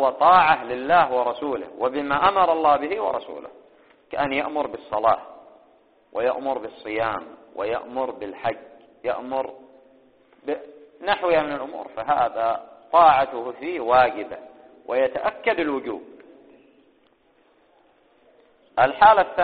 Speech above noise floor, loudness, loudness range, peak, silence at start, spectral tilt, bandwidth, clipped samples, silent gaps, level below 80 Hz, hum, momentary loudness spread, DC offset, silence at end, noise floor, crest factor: 39 dB; -22 LUFS; 9 LU; -2 dBFS; 0 s; -2 dB/octave; 4.8 kHz; under 0.1%; none; -58 dBFS; none; 17 LU; under 0.1%; 0 s; -61 dBFS; 22 dB